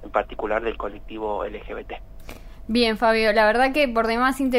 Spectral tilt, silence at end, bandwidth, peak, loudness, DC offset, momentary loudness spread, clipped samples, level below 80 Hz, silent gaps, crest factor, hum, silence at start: -4.5 dB/octave; 0 s; 16 kHz; -6 dBFS; -21 LUFS; under 0.1%; 18 LU; under 0.1%; -40 dBFS; none; 18 dB; none; 0 s